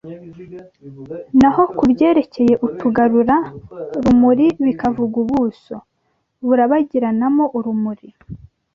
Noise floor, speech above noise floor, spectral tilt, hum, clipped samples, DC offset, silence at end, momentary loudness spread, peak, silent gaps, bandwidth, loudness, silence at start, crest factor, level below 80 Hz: -68 dBFS; 52 dB; -8 dB/octave; none; under 0.1%; under 0.1%; 0.4 s; 21 LU; -2 dBFS; none; 7 kHz; -16 LUFS; 0.05 s; 14 dB; -46 dBFS